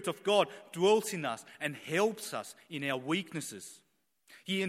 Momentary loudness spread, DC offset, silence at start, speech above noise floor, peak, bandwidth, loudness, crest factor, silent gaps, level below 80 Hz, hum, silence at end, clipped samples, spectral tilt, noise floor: 15 LU; under 0.1%; 0 s; 32 dB; -14 dBFS; 16.5 kHz; -33 LUFS; 20 dB; none; -82 dBFS; none; 0 s; under 0.1%; -4 dB/octave; -65 dBFS